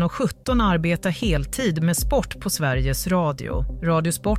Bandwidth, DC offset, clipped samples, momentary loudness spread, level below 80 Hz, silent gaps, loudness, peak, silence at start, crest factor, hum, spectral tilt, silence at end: 16 kHz; under 0.1%; under 0.1%; 5 LU; -30 dBFS; none; -23 LUFS; -8 dBFS; 0 s; 14 dB; none; -5.5 dB/octave; 0 s